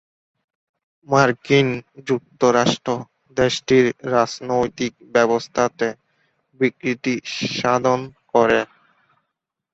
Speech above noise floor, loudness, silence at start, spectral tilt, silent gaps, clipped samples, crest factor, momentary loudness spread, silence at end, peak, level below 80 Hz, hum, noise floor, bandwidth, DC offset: 60 dB; -20 LUFS; 1.1 s; -5 dB/octave; none; under 0.1%; 20 dB; 9 LU; 1.1 s; -2 dBFS; -56 dBFS; none; -79 dBFS; 8 kHz; under 0.1%